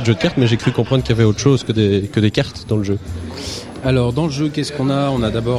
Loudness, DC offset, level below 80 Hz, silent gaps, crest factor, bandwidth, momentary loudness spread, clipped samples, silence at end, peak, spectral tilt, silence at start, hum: -17 LUFS; under 0.1%; -36 dBFS; none; 16 dB; 12 kHz; 9 LU; under 0.1%; 0 s; -2 dBFS; -6.5 dB/octave; 0 s; none